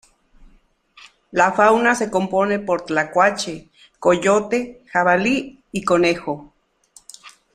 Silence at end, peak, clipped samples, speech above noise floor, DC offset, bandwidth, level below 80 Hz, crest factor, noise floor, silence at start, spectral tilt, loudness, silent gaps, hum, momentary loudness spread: 0.25 s; -2 dBFS; under 0.1%; 37 dB; under 0.1%; 14 kHz; -54 dBFS; 20 dB; -55 dBFS; 0.4 s; -4.5 dB/octave; -19 LUFS; none; none; 13 LU